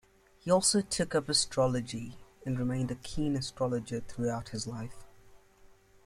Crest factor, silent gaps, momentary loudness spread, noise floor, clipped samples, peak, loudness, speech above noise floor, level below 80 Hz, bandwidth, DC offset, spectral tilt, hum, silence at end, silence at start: 20 dB; none; 15 LU; -59 dBFS; under 0.1%; -12 dBFS; -31 LUFS; 28 dB; -54 dBFS; 15 kHz; under 0.1%; -4 dB/octave; none; 0.3 s; 0.45 s